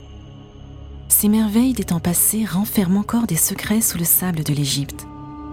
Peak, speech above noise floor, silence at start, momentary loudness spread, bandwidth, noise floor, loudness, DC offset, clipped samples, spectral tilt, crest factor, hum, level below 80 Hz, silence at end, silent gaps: 0 dBFS; 20 dB; 0 s; 17 LU; 17.5 kHz; -39 dBFS; -18 LUFS; under 0.1%; under 0.1%; -4 dB/octave; 20 dB; none; -40 dBFS; 0 s; none